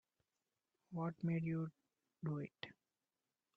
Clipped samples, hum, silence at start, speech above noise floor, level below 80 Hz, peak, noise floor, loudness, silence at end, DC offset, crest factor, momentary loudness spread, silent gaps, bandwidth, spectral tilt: under 0.1%; none; 0.9 s; over 47 dB; -82 dBFS; -28 dBFS; under -90 dBFS; -44 LUFS; 0.85 s; under 0.1%; 20 dB; 11 LU; none; 5.4 kHz; -9.5 dB/octave